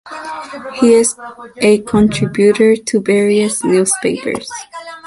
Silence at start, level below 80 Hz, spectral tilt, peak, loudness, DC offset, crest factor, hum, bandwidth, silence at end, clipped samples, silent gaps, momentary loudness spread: 0.05 s; -46 dBFS; -4.5 dB/octave; 0 dBFS; -13 LUFS; under 0.1%; 14 dB; none; 11.5 kHz; 0.1 s; under 0.1%; none; 16 LU